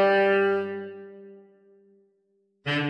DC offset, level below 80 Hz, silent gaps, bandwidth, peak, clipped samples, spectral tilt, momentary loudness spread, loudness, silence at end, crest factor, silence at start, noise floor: under 0.1%; -76 dBFS; none; 8.8 kHz; -10 dBFS; under 0.1%; -7 dB/octave; 24 LU; -25 LUFS; 0 s; 16 dB; 0 s; -70 dBFS